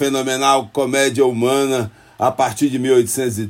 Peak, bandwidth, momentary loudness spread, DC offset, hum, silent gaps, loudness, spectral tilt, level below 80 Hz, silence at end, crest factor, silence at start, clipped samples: -2 dBFS; 16.5 kHz; 5 LU; under 0.1%; none; none; -17 LUFS; -4 dB/octave; -60 dBFS; 0 s; 16 dB; 0 s; under 0.1%